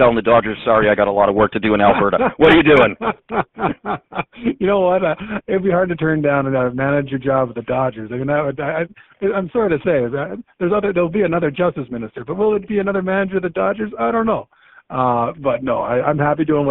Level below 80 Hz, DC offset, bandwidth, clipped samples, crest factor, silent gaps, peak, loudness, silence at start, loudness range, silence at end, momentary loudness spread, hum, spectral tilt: -44 dBFS; under 0.1%; 4.2 kHz; under 0.1%; 16 dB; none; 0 dBFS; -17 LUFS; 0 s; 6 LU; 0 s; 10 LU; none; -5 dB/octave